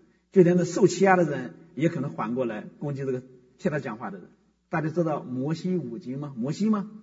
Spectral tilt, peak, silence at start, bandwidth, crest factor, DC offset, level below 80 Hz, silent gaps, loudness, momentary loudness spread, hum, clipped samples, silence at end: -7 dB/octave; -4 dBFS; 0.35 s; 7.8 kHz; 22 dB; under 0.1%; -70 dBFS; none; -26 LUFS; 14 LU; none; under 0.1%; 0 s